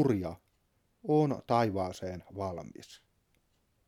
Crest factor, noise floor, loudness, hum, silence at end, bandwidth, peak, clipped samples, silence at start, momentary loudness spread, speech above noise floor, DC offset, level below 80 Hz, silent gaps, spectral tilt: 20 dB; -74 dBFS; -32 LUFS; none; 0.9 s; 15 kHz; -14 dBFS; under 0.1%; 0 s; 21 LU; 42 dB; under 0.1%; -64 dBFS; none; -7.5 dB/octave